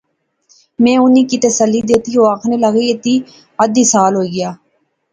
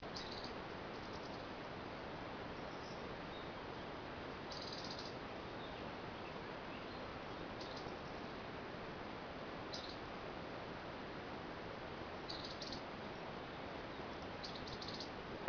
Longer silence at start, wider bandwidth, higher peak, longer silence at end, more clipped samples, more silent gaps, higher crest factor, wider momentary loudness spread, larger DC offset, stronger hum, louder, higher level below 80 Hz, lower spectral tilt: first, 0.8 s vs 0 s; first, 9.6 kHz vs 5.4 kHz; first, 0 dBFS vs -24 dBFS; first, 0.55 s vs 0 s; neither; neither; second, 14 dB vs 24 dB; first, 8 LU vs 3 LU; neither; neither; first, -12 LUFS vs -48 LUFS; first, -54 dBFS vs -64 dBFS; about the same, -4 dB/octave vs -3 dB/octave